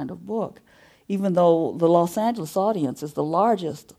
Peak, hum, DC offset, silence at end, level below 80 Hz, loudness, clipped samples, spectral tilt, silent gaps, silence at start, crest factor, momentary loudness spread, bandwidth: -6 dBFS; none; under 0.1%; 0.2 s; -66 dBFS; -22 LUFS; under 0.1%; -7 dB/octave; none; 0 s; 18 dB; 10 LU; 15.5 kHz